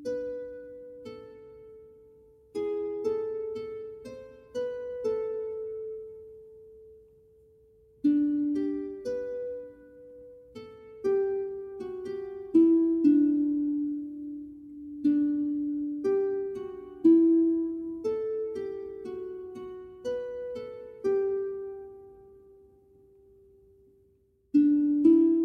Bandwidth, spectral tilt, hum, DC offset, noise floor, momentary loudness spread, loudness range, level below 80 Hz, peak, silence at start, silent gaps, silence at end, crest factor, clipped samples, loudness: 6.4 kHz; -8 dB/octave; none; under 0.1%; -66 dBFS; 23 LU; 10 LU; -66 dBFS; -12 dBFS; 0 s; none; 0 s; 18 dB; under 0.1%; -28 LUFS